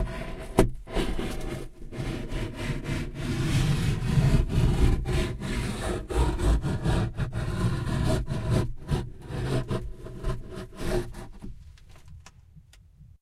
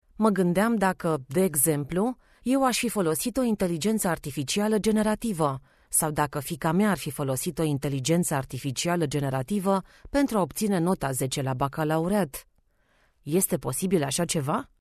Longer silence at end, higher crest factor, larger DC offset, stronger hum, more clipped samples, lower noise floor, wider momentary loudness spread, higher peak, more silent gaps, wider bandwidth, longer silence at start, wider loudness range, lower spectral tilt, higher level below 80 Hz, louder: about the same, 0.15 s vs 0.2 s; about the same, 22 dB vs 18 dB; neither; neither; neither; second, -53 dBFS vs -66 dBFS; first, 13 LU vs 6 LU; about the same, -6 dBFS vs -8 dBFS; neither; about the same, 14.5 kHz vs 14 kHz; second, 0 s vs 0.2 s; first, 8 LU vs 2 LU; first, -6.5 dB/octave vs -5 dB/octave; first, -32 dBFS vs -52 dBFS; second, -29 LUFS vs -26 LUFS